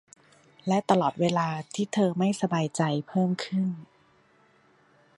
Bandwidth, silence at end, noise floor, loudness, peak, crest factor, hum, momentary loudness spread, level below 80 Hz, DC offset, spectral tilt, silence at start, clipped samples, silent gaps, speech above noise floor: 11.5 kHz; 1.35 s; -62 dBFS; -27 LUFS; -6 dBFS; 22 dB; none; 7 LU; -72 dBFS; under 0.1%; -6 dB/octave; 0.65 s; under 0.1%; none; 36 dB